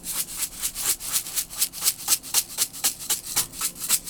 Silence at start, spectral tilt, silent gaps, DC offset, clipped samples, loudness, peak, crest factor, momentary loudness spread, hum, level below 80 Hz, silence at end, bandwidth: 0 s; 1 dB/octave; none; under 0.1%; under 0.1%; -24 LUFS; -2 dBFS; 24 dB; 6 LU; none; -54 dBFS; 0 s; over 20 kHz